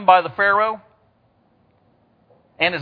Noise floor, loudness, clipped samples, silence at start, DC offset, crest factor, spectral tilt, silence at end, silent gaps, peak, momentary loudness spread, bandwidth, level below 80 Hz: -60 dBFS; -18 LUFS; under 0.1%; 0 s; under 0.1%; 22 dB; -6.5 dB/octave; 0 s; none; 0 dBFS; 9 LU; 4.8 kHz; -64 dBFS